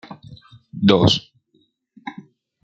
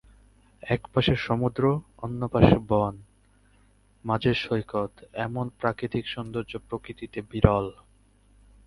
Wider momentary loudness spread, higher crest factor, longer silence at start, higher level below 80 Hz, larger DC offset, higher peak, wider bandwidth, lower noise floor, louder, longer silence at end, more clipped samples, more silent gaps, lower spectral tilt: first, 25 LU vs 14 LU; second, 20 dB vs 26 dB; second, 0.1 s vs 0.65 s; second, -54 dBFS vs -42 dBFS; neither; about the same, -2 dBFS vs 0 dBFS; second, 8 kHz vs 11.5 kHz; first, -64 dBFS vs -60 dBFS; first, -17 LUFS vs -27 LUFS; second, 0.5 s vs 0.95 s; neither; neither; second, -6 dB/octave vs -8 dB/octave